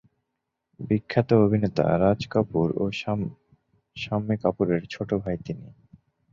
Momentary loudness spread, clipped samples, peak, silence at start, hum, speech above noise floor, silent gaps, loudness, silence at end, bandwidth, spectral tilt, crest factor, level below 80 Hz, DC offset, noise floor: 15 LU; under 0.1%; -6 dBFS; 0.8 s; none; 57 dB; none; -25 LUFS; 0.65 s; 7.4 kHz; -8 dB/octave; 20 dB; -52 dBFS; under 0.1%; -81 dBFS